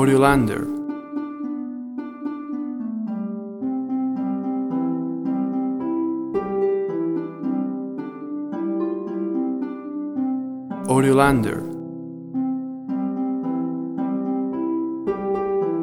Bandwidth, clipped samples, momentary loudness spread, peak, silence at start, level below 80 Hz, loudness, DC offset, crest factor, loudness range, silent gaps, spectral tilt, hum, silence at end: 13.5 kHz; under 0.1%; 12 LU; -2 dBFS; 0 s; -50 dBFS; -24 LUFS; under 0.1%; 22 dB; 5 LU; none; -7 dB/octave; none; 0 s